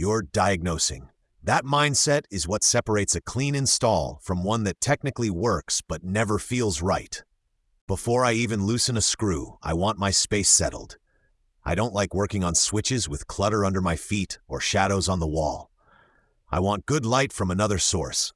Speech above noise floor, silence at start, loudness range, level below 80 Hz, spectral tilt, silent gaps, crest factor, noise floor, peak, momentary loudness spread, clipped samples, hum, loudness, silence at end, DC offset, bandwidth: 45 dB; 0 s; 4 LU; -46 dBFS; -3.5 dB/octave; 7.81-7.87 s; 18 dB; -70 dBFS; -6 dBFS; 9 LU; under 0.1%; none; -24 LUFS; 0.05 s; under 0.1%; 12 kHz